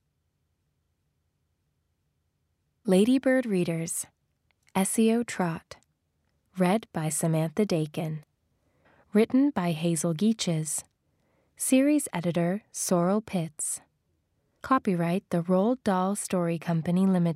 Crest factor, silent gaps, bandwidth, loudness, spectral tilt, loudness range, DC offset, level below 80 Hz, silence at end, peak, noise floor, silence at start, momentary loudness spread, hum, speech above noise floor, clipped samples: 18 dB; none; 16 kHz; -27 LUFS; -5.5 dB/octave; 3 LU; under 0.1%; -70 dBFS; 0 s; -10 dBFS; -76 dBFS; 2.85 s; 9 LU; none; 50 dB; under 0.1%